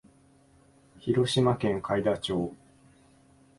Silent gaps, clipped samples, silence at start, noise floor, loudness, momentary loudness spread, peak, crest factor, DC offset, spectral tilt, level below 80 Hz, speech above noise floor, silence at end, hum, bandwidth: none; under 0.1%; 1.05 s; -60 dBFS; -28 LUFS; 9 LU; -12 dBFS; 18 dB; under 0.1%; -6 dB/octave; -58 dBFS; 33 dB; 1.05 s; none; 11.5 kHz